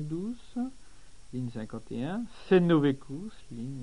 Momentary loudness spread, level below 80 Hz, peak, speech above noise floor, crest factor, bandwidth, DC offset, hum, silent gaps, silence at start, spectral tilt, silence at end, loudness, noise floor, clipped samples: 17 LU; -56 dBFS; -10 dBFS; 23 dB; 20 dB; 10.5 kHz; 0.5%; none; none; 0 s; -8 dB/octave; 0 s; -30 LUFS; -53 dBFS; under 0.1%